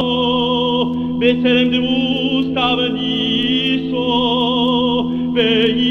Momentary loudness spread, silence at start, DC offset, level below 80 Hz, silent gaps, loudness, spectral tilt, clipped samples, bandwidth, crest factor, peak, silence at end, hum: 4 LU; 0 s; under 0.1%; -46 dBFS; none; -16 LUFS; -6.5 dB/octave; under 0.1%; 6.6 kHz; 14 dB; -2 dBFS; 0 s; none